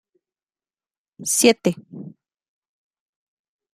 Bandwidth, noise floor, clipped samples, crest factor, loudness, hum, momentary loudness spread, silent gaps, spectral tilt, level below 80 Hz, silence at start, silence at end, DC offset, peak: 15.5 kHz; under -90 dBFS; under 0.1%; 26 dB; -19 LUFS; none; 23 LU; none; -3 dB/octave; -68 dBFS; 1.2 s; 1.65 s; under 0.1%; 0 dBFS